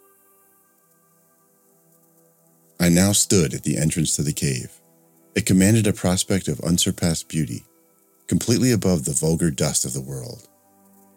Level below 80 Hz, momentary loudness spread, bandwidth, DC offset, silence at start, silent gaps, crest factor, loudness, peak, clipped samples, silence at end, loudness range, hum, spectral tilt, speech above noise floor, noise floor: -46 dBFS; 13 LU; 17 kHz; under 0.1%; 2.8 s; none; 20 dB; -20 LUFS; -2 dBFS; under 0.1%; 0.8 s; 2 LU; none; -4.5 dB/octave; 39 dB; -60 dBFS